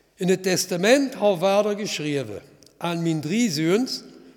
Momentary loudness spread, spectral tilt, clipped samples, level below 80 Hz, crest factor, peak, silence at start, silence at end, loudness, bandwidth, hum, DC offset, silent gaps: 11 LU; -4.5 dB/octave; under 0.1%; -70 dBFS; 18 dB; -4 dBFS; 0.2 s; 0.05 s; -22 LUFS; 18.5 kHz; none; under 0.1%; none